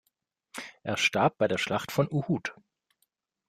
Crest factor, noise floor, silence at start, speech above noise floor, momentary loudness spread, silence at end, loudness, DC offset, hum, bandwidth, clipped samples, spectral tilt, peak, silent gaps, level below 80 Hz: 20 dB; -79 dBFS; 0.55 s; 51 dB; 17 LU; 0.95 s; -28 LUFS; under 0.1%; none; 15.5 kHz; under 0.1%; -5 dB/octave; -12 dBFS; none; -66 dBFS